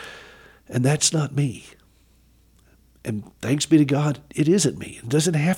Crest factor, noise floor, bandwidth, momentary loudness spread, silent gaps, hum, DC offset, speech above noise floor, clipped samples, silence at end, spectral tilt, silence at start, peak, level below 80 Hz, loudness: 18 dB; -57 dBFS; 16.5 kHz; 17 LU; none; none; under 0.1%; 36 dB; under 0.1%; 0 s; -5 dB/octave; 0 s; -4 dBFS; -56 dBFS; -22 LUFS